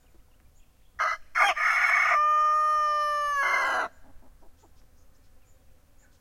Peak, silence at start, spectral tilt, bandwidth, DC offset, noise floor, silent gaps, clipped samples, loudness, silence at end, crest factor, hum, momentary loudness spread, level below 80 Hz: -8 dBFS; 1 s; 0 dB/octave; 15.5 kHz; under 0.1%; -56 dBFS; none; under 0.1%; -24 LUFS; 1.7 s; 20 dB; none; 8 LU; -60 dBFS